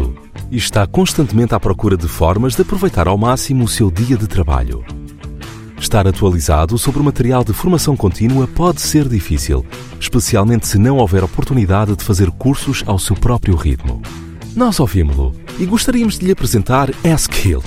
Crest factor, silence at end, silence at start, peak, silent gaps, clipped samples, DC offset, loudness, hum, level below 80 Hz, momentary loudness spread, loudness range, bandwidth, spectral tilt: 12 dB; 0 s; 0 s; -2 dBFS; none; under 0.1%; under 0.1%; -14 LUFS; none; -22 dBFS; 10 LU; 2 LU; 16.5 kHz; -5.5 dB/octave